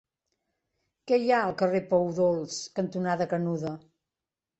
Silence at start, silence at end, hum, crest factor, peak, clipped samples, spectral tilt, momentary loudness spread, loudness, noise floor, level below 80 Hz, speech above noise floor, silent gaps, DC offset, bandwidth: 1.05 s; 0.8 s; none; 18 dB; -12 dBFS; under 0.1%; -6 dB/octave; 9 LU; -27 LUFS; -90 dBFS; -68 dBFS; 63 dB; none; under 0.1%; 8.2 kHz